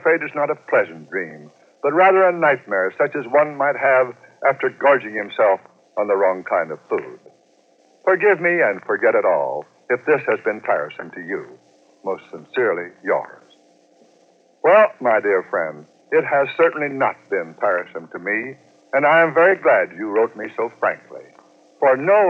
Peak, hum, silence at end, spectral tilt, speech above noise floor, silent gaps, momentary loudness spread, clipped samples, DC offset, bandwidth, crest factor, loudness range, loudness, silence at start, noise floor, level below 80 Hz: -2 dBFS; none; 0 s; -7 dB/octave; 38 dB; none; 14 LU; under 0.1%; under 0.1%; 6.6 kHz; 18 dB; 6 LU; -19 LUFS; 0.05 s; -57 dBFS; under -90 dBFS